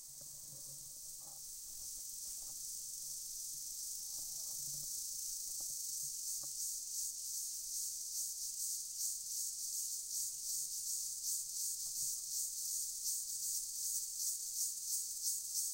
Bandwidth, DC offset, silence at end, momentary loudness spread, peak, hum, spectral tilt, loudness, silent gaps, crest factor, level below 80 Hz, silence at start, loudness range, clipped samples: 16 kHz; under 0.1%; 0 s; 8 LU; -24 dBFS; none; 2 dB/octave; -40 LUFS; none; 20 dB; -74 dBFS; 0 s; 5 LU; under 0.1%